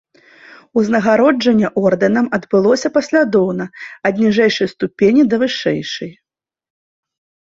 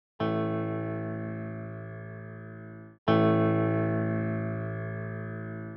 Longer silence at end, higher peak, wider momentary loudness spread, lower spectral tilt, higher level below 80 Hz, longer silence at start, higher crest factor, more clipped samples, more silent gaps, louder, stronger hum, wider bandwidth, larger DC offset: first, 1.45 s vs 0 s; first, -2 dBFS vs -10 dBFS; second, 9 LU vs 18 LU; second, -5.5 dB/octave vs -10.5 dB/octave; first, -56 dBFS vs -66 dBFS; first, 0.75 s vs 0.2 s; second, 14 dB vs 20 dB; neither; second, none vs 2.98-3.06 s; first, -15 LUFS vs -30 LUFS; neither; first, 7.8 kHz vs 5.6 kHz; neither